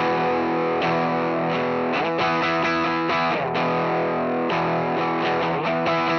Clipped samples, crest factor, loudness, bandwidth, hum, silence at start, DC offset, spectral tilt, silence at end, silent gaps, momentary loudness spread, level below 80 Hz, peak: under 0.1%; 10 dB; -22 LUFS; 6.6 kHz; none; 0 s; under 0.1%; -6.5 dB/octave; 0 s; none; 2 LU; -58 dBFS; -12 dBFS